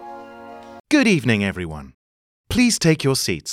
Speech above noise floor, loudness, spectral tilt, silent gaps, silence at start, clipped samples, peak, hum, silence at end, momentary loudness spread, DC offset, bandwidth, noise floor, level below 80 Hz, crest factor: 20 dB; -18 LUFS; -4.5 dB/octave; 0.80-0.84 s, 1.94-2.44 s; 0 s; under 0.1%; -4 dBFS; none; 0 s; 22 LU; under 0.1%; 16 kHz; -39 dBFS; -44 dBFS; 18 dB